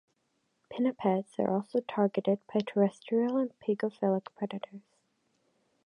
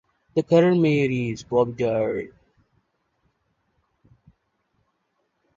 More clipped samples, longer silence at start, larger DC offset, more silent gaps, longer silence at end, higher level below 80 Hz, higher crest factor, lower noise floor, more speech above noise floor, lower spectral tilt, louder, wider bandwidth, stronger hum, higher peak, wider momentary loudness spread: neither; first, 0.7 s vs 0.35 s; neither; neither; second, 1.05 s vs 3.3 s; second, -80 dBFS vs -60 dBFS; about the same, 18 dB vs 20 dB; first, -77 dBFS vs -73 dBFS; second, 47 dB vs 52 dB; about the same, -8 dB/octave vs -7.5 dB/octave; second, -31 LUFS vs -22 LUFS; first, 10 kHz vs 7.6 kHz; neither; second, -14 dBFS vs -4 dBFS; about the same, 9 LU vs 10 LU